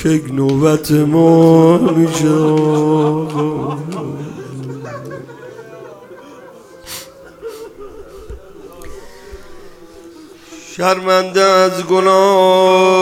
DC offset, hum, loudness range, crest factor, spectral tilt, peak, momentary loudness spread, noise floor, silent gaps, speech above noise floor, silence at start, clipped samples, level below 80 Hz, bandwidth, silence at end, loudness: under 0.1%; none; 21 LU; 14 dB; -6 dB/octave; 0 dBFS; 25 LU; -38 dBFS; none; 26 dB; 0 s; under 0.1%; -46 dBFS; 17 kHz; 0 s; -12 LUFS